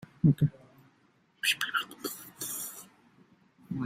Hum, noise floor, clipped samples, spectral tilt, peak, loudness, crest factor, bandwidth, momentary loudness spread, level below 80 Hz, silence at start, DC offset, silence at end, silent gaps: none; -67 dBFS; under 0.1%; -4 dB/octave; -10 dBFS; -31 LUFS; 24 dB; 16 kHz; 14 LU; -62 dBFS; 0 s; under 0.1%; 0 s; none